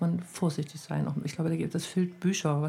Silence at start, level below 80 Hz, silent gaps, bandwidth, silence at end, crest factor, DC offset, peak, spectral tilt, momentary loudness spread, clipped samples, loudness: 0 s; -66 dBFS; none; 15 kHz; 0 s; 14 dB; under 0.1%; -16 dBFS; -6 dB/octave; 4 LU; under 0.1%; -31 LUFS